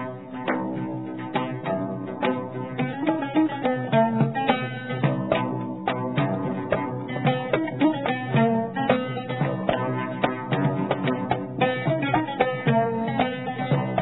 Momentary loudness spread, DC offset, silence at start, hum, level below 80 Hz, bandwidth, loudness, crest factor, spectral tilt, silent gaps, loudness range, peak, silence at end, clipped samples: 7 LU; 0.2%; 0 s; none; -58 dBFS; 4.1 kHz; -25 LUFS; 20 dB; -11 dB/octave; none; 2 LU; -4 dBFS; 0 s; under 0.1%